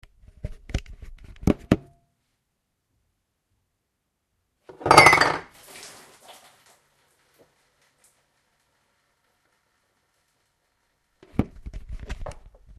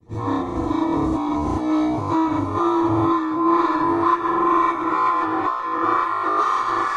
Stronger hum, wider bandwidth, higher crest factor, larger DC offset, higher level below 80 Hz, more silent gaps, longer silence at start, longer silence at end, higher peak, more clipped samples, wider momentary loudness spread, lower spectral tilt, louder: neither; first, 13.5 kHz vs 9.2 kHz; first, 28 dB vs 14 dB; neither; about the same, -42 dBFS vs -44 dBFS; neither; first, 0.45 s vs 0.1 s; first, 0.45 s vs 0 s; first, 0 dBFS vs -6 dBFS; neither; first, 29 LU vs 4 LU; second, -4 dB/octave vs -7 dB/octave; about the same, -20 LUFS vs -20 LUFS